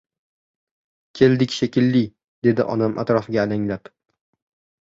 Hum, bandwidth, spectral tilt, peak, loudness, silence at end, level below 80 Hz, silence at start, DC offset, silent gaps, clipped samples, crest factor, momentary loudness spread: none; 7.8 kHz; -7 dB/octave; -2 dBFS; -20 LUFS; 1.05 s; -56 dBFS; 1.15 s; under 0.1%; 2.28-2.42 s; under 0.1%; 20 dB; 8 LU